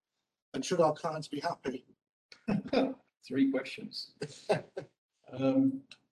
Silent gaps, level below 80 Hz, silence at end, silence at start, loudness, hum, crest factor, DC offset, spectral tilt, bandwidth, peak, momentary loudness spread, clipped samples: 2.09-2.29 s, 4.98-5.09 s; -70 dBFS; 0.3 s; 0.55 s; -33 LUFS; none; 18 dB; under 0.1%; -6 dB/octave; 11.5 kHz; -16 dBFS; 16 LU; under 0.1%